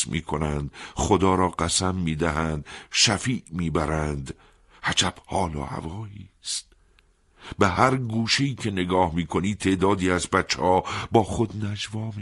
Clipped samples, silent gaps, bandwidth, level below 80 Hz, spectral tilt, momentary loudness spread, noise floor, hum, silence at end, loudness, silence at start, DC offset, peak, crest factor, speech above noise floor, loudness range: under 0.1%; none; 12 kHz; -42 dBFS; -4 dB/octave; 13 LU; -60 dBFS; none; 0 s; -24 LUFS; 0 s; under 0.1%; -4 dBFS; 22 dB; 36 dB; 5 LU